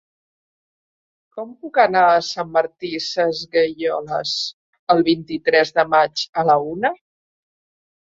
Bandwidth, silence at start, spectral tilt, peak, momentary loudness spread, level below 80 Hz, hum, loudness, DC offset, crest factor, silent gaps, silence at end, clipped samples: 7.8 kHz; 1.35 s; -4 dB/octave; -2 dBFS; 13 LU; -62 dBFS; none; -19 LUFS; under 0.1%; 18 dB; 4.53-4.73 s, 4.79-4.87 s, 6.29-6.33 s; 1.15 s; under 0.1%